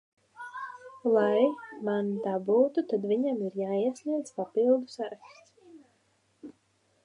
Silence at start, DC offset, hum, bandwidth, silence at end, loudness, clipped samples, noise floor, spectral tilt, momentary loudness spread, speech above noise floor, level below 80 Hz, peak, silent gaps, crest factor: 0.4 s; under 0.1%; none; 11 kHz; 0.55 s; -29 LUFS; under 0.1%; -70 dBFS; -7 dB/octave; 15 LU; 42 dB; -84 dBFS; -12 dBFS; none; 18 dB